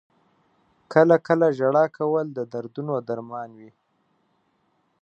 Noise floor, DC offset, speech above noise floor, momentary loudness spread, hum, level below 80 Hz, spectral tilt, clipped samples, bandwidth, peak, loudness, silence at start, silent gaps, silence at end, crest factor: -69 dBFS; under 0.1%; 47 dB; 15 LU; none; -74 dBFS; -8.5 dB/octave; under 0.1%; 7.6 kHz; -2 dBFS; -22 LUFS; 0.9 s; none; 1.35 s; 22 dB